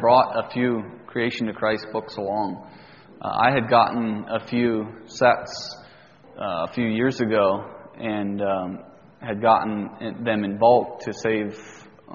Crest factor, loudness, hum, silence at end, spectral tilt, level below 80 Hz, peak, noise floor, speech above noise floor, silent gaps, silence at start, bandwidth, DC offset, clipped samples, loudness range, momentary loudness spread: 20 dB; -23 LUFS; none; 0 s; -4 dB/octave; -60 dBFS; -2 dBFS; -49 dBFS; 27 dB; none; 0 s; 7.2 kHz; under 0.1%; under 0.1%; 3 LU; 15 LU